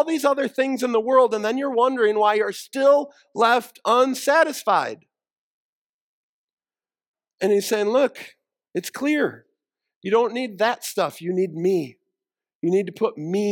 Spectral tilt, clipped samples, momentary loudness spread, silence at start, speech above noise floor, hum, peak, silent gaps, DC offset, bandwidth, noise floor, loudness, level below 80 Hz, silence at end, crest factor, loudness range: -4.5 dB/octave; under 0.1%; 9 LU; 0 s; over 69 dB; none; -4 dBFS; 5.32-6.57 s, 7.07-7.14 s, 9.96-10.01 s, 12.55-12.60 s; under 0.1%; 18 kHz; under -90 dBFS; -21 LUFS; -80 dBFS; 0 s; 18 dB; 6 LU